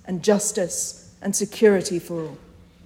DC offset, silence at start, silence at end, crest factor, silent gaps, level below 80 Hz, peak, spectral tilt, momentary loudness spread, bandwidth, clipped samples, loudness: under 0.1%; 0.05 s; 0.5 s; 18 dB; none; -58 dBFS; -4 dBFS; -4 dB/octave; 13 LU; 16.5 kHz; under 0.1%; -22 LUFS